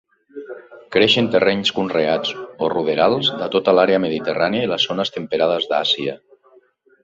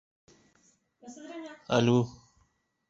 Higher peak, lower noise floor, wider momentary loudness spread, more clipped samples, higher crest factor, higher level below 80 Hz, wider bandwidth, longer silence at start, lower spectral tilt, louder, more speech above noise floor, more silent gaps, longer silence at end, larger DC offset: first, -2 dBFS vs -10 dBFS; second, -54 dBFS vs -72 dBFS; second, 13 LU vs 22 LU; neither; about the same, 18 dB vs 22 dB; first, -58 dBFS vs -66 dBFS; about the same, 7.8 kHz vs 7.8 kHz; second, 0.35 s vs 1.05 s; second, -5 dB/octave vs -6.5 dB/octave; first, -18 LUFS vs -27 LUFS; second, 36 dB vs 44 dB; neither; about the same, 0.9 s vs 0.8 s; neither